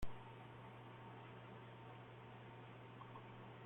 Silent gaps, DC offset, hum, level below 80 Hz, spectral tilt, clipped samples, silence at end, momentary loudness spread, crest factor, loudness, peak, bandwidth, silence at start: none; under 0.1%; none; -64 dBFS; -7 dB/octave; under 0.1%; 0 s; 1 LU; 20 dB; -57 LUFS; -32 dBFS; 16 kHz; 0 s